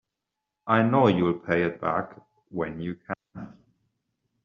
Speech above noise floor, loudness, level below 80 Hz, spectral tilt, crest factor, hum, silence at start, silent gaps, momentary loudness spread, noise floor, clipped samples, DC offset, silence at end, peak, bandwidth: 60 dB; -25 LUFS; -62 dBFS; -6 dB/octave; 22 dB; none; 0.65 s; none; 20 LU; -85 dBFS; under 0.1%; under 0.1%; 0.95 s; -4 dBFS; 7 kHz